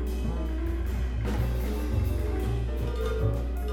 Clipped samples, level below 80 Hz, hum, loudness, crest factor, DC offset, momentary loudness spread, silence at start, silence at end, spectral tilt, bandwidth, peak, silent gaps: under 0.1%; -30 dBFS; none; -30 LUFS; 14 dB; under 0.1%; 3 LU; 0 s; 0 s; -7.5 dB/octave; 16.5 kHz; -14 dBFS; none